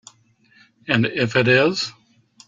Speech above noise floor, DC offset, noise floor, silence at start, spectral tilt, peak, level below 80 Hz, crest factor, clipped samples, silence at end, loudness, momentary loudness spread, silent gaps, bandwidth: 38 dB; under 0.1%; -57 dBFS; 0.85 s; -5.5 dB/octave; -4 dBFS; -60 dBFS; 18 dB; under 0.1%; 0.55 s; -19 LUFS; 12 LU; none; 7.8 kHz